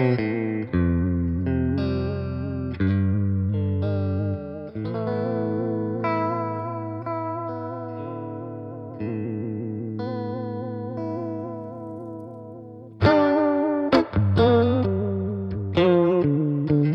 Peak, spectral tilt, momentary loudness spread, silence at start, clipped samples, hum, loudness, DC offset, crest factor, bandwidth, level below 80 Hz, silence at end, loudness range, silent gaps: -4 dBFS; -9.5 dB/octave; 15 LU; 0 s; under 0.1%; none; -24 LUFS; under 0.1%; 20 dB; 5.8 kHz; -44 dBFS; 0 s; 10 LU; none